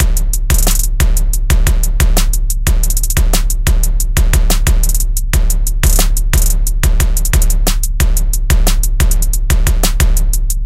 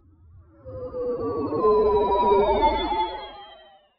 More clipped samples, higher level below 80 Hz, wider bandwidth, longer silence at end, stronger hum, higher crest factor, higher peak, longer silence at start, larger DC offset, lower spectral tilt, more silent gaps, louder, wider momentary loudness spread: neither; first, -10 dBFS vs -42 dBFS; first, 16.5 kHz vs 5.2 kHz; second, 0 s vs 0.45 s; neither; second, 10 dB vs 16 dB; first, 0 dBFS vs -8 dBFS; second, 0 s vs 0.65 s; neither; about the same, -3.5 dB/octave vs -4 dB/octave; neither; first, -15 LUFS vs -22 LUFS; second, 3 LU vs 18 LU